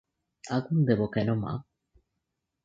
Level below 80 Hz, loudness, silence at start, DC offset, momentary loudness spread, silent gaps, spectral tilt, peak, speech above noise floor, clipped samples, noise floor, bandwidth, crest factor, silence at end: -60 dBFS; -28 LUFS; 0.45 s; under 0.1%; 12 LU; none; -8 dB/octave; -10 dBFS; 56 dB; under 0.1%; -83 dBFS; 7.8 kHz; 20 dB; 1 s